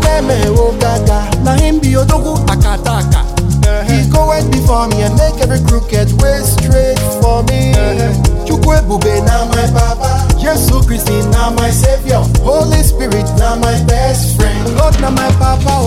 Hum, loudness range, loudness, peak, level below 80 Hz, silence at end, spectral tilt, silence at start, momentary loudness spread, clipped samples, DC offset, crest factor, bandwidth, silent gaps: none; 0 LU; -11 LUFS; 0 dBFS; -14 dBFS; 0 s; -5.5 dB/octave; 0 s; 2 LU; 0.4%; under 0.1%; 10 dB; 16 kHz; none